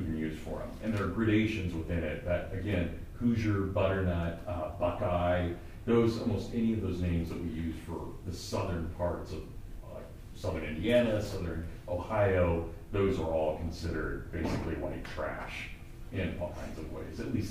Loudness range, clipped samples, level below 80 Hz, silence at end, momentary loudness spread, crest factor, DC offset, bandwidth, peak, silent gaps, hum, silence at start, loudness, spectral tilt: 6 LU; under 0.1%; -44 dBFS; 0 s; 13 LU; 18 dB; under 0.1%; 15.5 kHz; -14 dBFS; none; none; 0 s; -33 LUFS; -7 dB/octave